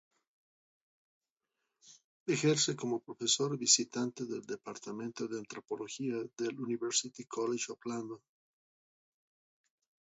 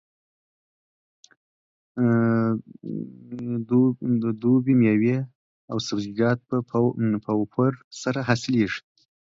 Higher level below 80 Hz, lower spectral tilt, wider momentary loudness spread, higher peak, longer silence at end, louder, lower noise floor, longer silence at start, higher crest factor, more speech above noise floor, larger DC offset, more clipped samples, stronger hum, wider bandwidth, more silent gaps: second, -84 dBFS vs -64 dBFS; second, -4 dB/octave vs -7 dB/octave; about the same, 15 LU vs 14 LU; second, -12 dBFS vs -6 dBFS; first, 1.9 s vs 0.5 s; second, -34 LUFS vs -24 LUFS; about the same, -88 dBFS vs under -90 dBFS; about the same, 1.85 s vs 1.95 s; first, 26 dB vs 18 dB; second, 52 dB vs over 67 dB; neither; neither; neither; about the same, 8 kHz vs 7.8 kHz; second, 2.04-2.26 s vs 5.35-5.68 s, 7.84-7.91 s